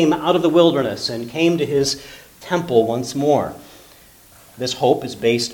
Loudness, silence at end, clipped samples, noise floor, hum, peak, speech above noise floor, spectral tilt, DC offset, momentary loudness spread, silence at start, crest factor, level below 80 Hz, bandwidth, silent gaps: -19 LUFS; 0 s; under 0.1%; -47 dBFS; none; 0 dBFS; 29 dB; -5 dB/octave; under 0.1%; 13 LU; 0 s; 18 dB; -54 dBFS; 19 kHz; none